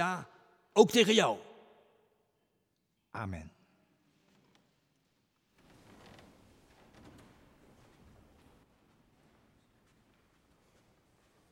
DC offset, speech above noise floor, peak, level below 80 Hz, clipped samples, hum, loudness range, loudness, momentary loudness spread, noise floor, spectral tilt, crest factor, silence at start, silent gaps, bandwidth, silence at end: under 0.1%; 51 dB; -8 dBFS; -72 dBFS; under 0.1%; none; 29 LU; -29 LUFS; 30 LU; -79 dBFS; -4 dB/octave; 30 dB; 0 s; none; 16.5 kHz; 8.05 s